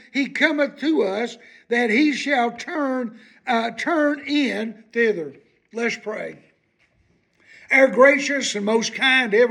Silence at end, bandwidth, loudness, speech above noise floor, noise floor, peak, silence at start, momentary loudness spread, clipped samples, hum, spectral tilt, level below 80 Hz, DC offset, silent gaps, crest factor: 0 s; 11 kHz; -20 LUFS; 43 dB; -64 dBFS; -2 dBFS; 0.15 s; 14 LU; under 0.1%; none; -3.5 dB/octave; -74 dBFS; under 0.1%; none; 20 dB